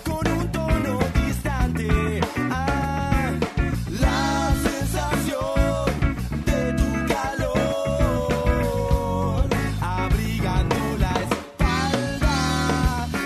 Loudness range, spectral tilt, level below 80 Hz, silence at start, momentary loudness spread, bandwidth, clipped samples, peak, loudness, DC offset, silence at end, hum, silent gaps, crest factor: 1 LU; -6 dB/octave; -28 dBFS; 0 s; 3 LU; 13.5 kHz; under 0.1%; -8 dBFS; -23 LUFS; under 0.1%; 0 s; none; none; 14 dB